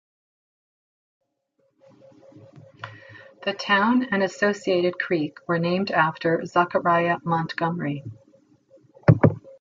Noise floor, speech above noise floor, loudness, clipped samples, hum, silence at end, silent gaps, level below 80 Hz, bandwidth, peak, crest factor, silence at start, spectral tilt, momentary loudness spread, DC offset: -70 dBFS; 47 dB; -23 LUFS; under 0.1%; none; 0.1 s; none; -54 dBFS; 7.6 kHz; -2 dBFS; 24 dB; 2.55 s; -7 dB/octave; 12 LU; under 0.1%